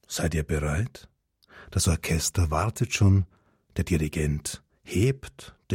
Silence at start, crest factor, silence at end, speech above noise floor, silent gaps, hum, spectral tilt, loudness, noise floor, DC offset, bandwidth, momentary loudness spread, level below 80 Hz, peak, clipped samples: 0.1 s; 16 dB; 0 s; 28 dB; none; none; -5 dB/octave; -27 LUFS; -54 dBFS; under 0.1%; 16.5 kHz; 14 LU; -38 dBFS; -10 dBFS; under 0.1%